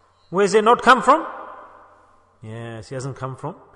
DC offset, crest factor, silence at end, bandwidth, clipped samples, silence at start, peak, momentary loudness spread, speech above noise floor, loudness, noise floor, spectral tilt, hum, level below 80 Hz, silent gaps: under 0.1%; 20 dB; 0.25 s; 10.5 kHz; under 0.1%; 0.3 s; -2 dBFS; 22 LU; 35 dB; -17 LUFS; -54 dBFS; -4.5 dB/octave; none; -56 dBFS; none